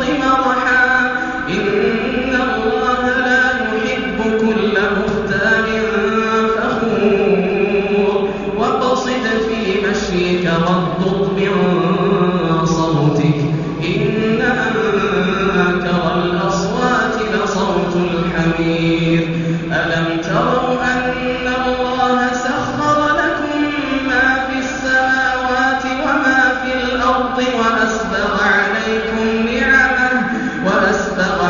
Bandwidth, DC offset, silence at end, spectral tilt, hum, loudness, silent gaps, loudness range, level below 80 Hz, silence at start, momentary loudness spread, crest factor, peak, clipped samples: 7.2 kHz; under 0.1%; 0 s; -4 dB/octave; none; -15 LUFS; none; 2 LU; -38 dBFS; 0 s; 4 LU; 14 dB; -2 dBFS; under 0.1%